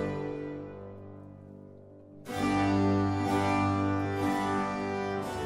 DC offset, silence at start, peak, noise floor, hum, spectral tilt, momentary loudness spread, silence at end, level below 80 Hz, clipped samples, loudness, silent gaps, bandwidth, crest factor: under 0.1%; 0 s; -16 dBFS; -51 dBFS; 50 Hz at -55 dBFS; -6.5 dB/octave; 22 LU; 0 s; -56 dBFS; under 0.1%; -30 LUFS; none; 15.5 kHz; 14 dB